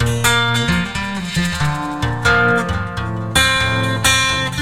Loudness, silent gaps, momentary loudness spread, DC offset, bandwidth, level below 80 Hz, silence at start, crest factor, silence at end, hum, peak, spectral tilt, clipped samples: -16 LUFS; none; 8 LU; 1%; 16.5 kHz; -34 dBFS; 0 s; 16 dB; 0 s; none; 0 dBFS; -3.5 dB/octave; under 0.1%